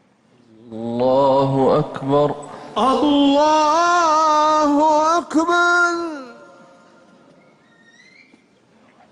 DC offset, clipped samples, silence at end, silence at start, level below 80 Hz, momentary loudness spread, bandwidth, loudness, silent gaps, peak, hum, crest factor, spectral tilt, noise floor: under 0.1%; under 0.1%; 2.8 s; 0.65 s; -56 dBFS; 13 LU; 11.5 kHz; -16 LUFS; none; -6 dBFS; none; 12 dB; -5 dB/octave; -55 dBFS